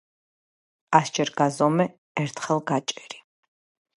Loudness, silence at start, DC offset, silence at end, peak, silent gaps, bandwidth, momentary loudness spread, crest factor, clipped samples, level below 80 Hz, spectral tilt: -24 LUFS; 0.9 s; under 0.1%; 0.8 s; -2 dBFS; 1.98-2.15 s; 11.5 kHz; 14 LU; 24 dB; under 0.1%; -74 dBFS; -5 dB/octave